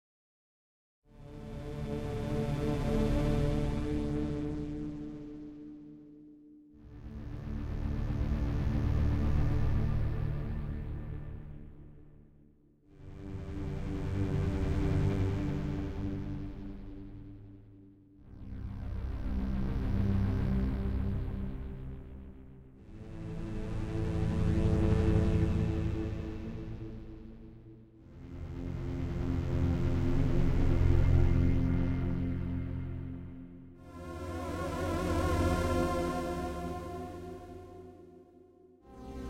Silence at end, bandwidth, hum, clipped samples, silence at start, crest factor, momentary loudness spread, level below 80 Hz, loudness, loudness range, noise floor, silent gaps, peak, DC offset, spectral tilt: 0 s; 13.5 kHz; none; under 0.1%; 1.15 s; 20 dB; 21 LU; -38 dBFS; -34 LUFS; 11 LU; -62 dBFS; none; -14 dBFS; under 0.1%; -8 dB/octave